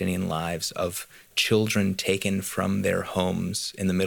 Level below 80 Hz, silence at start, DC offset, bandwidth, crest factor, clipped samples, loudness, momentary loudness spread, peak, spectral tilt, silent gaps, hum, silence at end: -56 dBFS; 0 s; under 0.1%; 19 kHz; 16 dB; under 0.1%; -26 LUFS; 7 LU; -10 dBFS; -4.5 dB/octave; none; none; 0 s